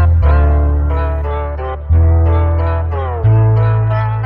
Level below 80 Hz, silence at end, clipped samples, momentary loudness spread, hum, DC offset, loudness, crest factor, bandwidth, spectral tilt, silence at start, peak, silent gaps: -18 dBFS; 0 s; under 0.1%; 8 LU; none; under 0.1%; -14 LUFS; 10 dB; 4.1 kHz; -11 dB/octave; 0 s; -2 dBFS; none